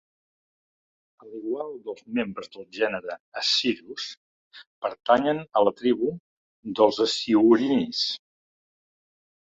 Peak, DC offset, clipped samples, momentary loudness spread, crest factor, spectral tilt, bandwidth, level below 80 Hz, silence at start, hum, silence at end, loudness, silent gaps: -6 dBFS; under 0.1%; under 0.1%; 16 LU; 22 dB; -4 dB/octave; 7.8 kHz; -68 dBFS; 1.25 s; none; 1.3 s; -24 LUFS; 3.20-3.32 s, 4.17-4.51 s, 4.67-4.82 s, 6.20-6.63 s